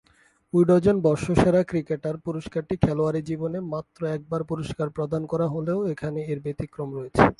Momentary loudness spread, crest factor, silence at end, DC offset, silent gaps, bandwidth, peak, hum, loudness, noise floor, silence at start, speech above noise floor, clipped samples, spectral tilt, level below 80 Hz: 11 LU; 22 dB; 0.05 s; under 0.1%; none; 11.5 kHz; -2 dBFS; none; -25 LUFS; -61 dBFS; 0.55 s; 37 dB; under 0.1%; -8 dB/octave; -46 dBFS